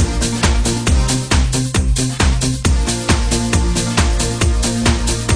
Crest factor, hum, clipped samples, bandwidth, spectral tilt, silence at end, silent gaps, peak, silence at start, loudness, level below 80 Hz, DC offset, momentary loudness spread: 14 dB; none; under 0.1%; 10.5 kHz; -4 dB/octave; 0 s; none; 0 dBFS; 0 s; -16 LUFS; -18 dBFS; 0.2%; 1 LU